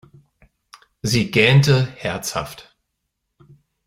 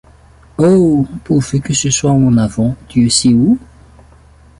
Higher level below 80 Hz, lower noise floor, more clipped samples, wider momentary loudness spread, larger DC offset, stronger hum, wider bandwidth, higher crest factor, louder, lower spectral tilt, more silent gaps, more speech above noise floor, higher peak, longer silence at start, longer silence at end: second, -50 dBFS vs -38 dBFS; first, -76 dBFS vs -43 dBFS; neither; first, 15 LU vs 6 LU; neither; neither; first, 16 kHz vs 11.5 kHz; first, 20 dB vs 14 dB; second, -18 LUFS vs -12 LUFS; about the same, -5 dB/octave vs -5.5 dB/octave; neither; first, 59 dB vs 31 dB; about the same, -2 dBFS vs 0 dBFS; first, 1.05 s vs 0.6 s; first, 1.25 s vs 1 s